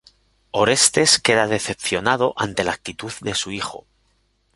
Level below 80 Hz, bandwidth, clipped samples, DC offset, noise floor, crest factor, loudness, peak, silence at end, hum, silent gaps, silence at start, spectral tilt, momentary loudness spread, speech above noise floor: -52 dBFS; 12 kHz; under 0.1%; under 0.1%; -64 dBFS; 22 dB; -19 LUFS; 0 dBFS; 0.75 s; none; none; 0.55 s; -2 dB/octave; 14 LU; 44 dB